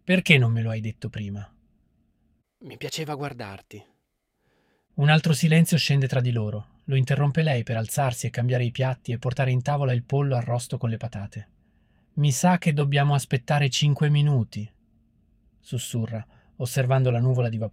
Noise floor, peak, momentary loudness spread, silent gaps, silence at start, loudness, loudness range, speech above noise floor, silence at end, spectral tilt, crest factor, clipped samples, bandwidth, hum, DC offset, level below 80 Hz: -75 dBFS; -2 dBFS; 16 LU; none; 0.05 s; -24 LUFS; 10 LU; 51 dB; 0.05 s; -5.5 dB/octave; 22 dB; under 0.1%; 16 kHz; none; under 0.1%; -58 dBFS